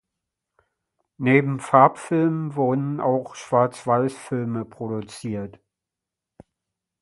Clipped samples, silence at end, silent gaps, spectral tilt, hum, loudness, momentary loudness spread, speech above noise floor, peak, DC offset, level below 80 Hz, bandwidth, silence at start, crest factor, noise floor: under 0.1%; 1.5 s; none; -7.5 dB/octave; none; -22 LUFS; 14 LU; 65 dB; 0 dBFS; under 0.1%; -64 dBFS; 11.5 kHz; 1.2 s; 22 dB; -86 dBFS